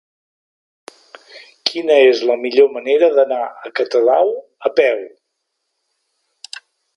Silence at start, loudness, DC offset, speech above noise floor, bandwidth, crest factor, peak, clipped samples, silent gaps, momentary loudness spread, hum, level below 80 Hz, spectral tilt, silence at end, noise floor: 1.35 s; -15 LUFS; under 0.1%; 59 dB; 11 kHz; 18 dB; 0 dBFS; under 0.1%; none; 21 LU; none; -74 dBFS; -3 dB/octave; 1.9 s; -74 dBFS